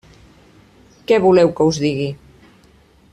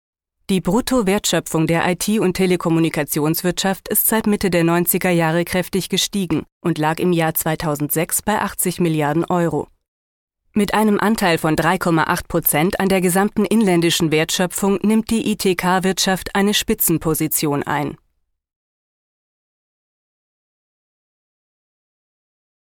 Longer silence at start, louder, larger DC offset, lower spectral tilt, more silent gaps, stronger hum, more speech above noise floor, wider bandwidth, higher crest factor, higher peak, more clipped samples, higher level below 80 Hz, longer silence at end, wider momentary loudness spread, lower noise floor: first, 1.1 s vs 0.5 s; about the same, -16 LUFS vs -18 LUFS; neither; first, -6 dB/octave vs -4.5 dB/octave; second, none vs 6.52-6.61 s, 9.88-10.28 s; neither; second, 36 dB vs 51 dB; second, 10 kHz vs 17.5 kHz; about the same, 16 dB vs 16 dB; about the same, -4 dBFS vs -2 dBFS; neither; second, -52 dBFS vs -44 dBFS; second, 1 s vs 4.7 s; first, 20 LU vs 5 LU; second, -51 dBFS vs -68 dBFS